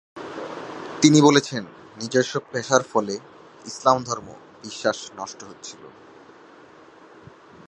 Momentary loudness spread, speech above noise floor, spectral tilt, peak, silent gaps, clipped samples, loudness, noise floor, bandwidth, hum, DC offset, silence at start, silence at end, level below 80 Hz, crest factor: 22 LU; 27 dB; -4.5 dB/octave; 0 dBFS; none; under 0.1%; -21 LUFS; -48 dBFS; 9.2 kHz; none; under 0.1%; 0.15 s; 1.8 s; -66 dBFS; 24 dB